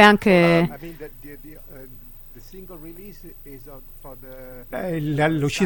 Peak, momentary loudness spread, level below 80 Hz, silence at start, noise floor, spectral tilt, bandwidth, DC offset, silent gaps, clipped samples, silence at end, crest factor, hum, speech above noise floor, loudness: 0 dBFS; 25 LU; -44 dBFS; 0 s; -41 dBFS; -6 dB/octave; 17 kHz; under 0.1%; none; under 0.1%; 0 s; 22 dB; none; 20 dB; -19 LUFS